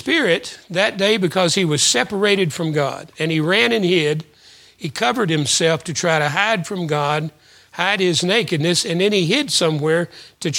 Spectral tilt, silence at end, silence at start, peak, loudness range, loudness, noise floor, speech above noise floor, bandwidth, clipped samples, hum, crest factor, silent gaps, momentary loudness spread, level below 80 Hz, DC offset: -3.5 dB/octave; 0 s; 0 s; 0 dBFS; 2 LU; -18 LUFS; -48 dBFS; 30 dB; 17 kHz; under 0.1%; none; 18 dB; none; 9 LU; -62 dBFS; under 0.1%